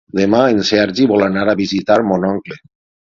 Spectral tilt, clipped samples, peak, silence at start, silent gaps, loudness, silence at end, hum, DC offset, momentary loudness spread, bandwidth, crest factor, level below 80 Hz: -6 dB/octave; under 0.1%; 0 dBFS; 0.15 s; none; -14 LUFS; 0.5 s; none; under 0.1%; 6 LU; 7.6 kHz; 14 dB; -48 dBFS